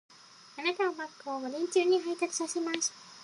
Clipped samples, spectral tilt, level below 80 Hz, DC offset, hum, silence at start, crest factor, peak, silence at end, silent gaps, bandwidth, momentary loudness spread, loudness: under 0.1%; -1 dB/octave; -86 dBFS; under 0.1%; none; 0.3 s; 20 dB; -12 dBFS; 0 s; none; 11.5 kHz; 11 LU; -31 LUFS